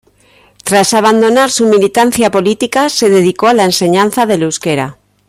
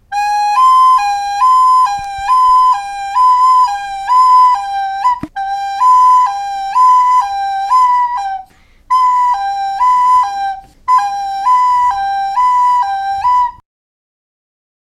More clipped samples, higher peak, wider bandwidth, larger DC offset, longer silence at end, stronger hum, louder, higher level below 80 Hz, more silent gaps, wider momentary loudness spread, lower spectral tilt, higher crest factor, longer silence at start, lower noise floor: neither; about the same, 0 dBFS vs -2 dBFS; first, 16 kHz vs 12 kHz; neither; second, 0.35 s vs 1.25 s; neither; about the same, -10 LUFS vs -11 LUFS; about the same, -50 dBFS vs -46 dBFS; neither; second, 6 LU vs 11 LU; first, -4 dB/octave vs -1 dB/octave; about the same, 10 dB vs 10 dB; first, 0.65 s vs 0.1 s; first, -47 dBFS vs -40 dBFS